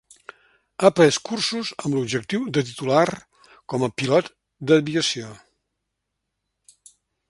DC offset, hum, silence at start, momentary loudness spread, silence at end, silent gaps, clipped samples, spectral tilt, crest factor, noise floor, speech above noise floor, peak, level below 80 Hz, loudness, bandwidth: under 0.1%; none; 0.8 s; 14 LU; 1.95 s; none; under 0.1%; -4.5 dB/octave; 24 dB; -79 dBFS; 58 dB; 0 dBFS; -64 dBFS; -21 LUFS; 11.5 kHz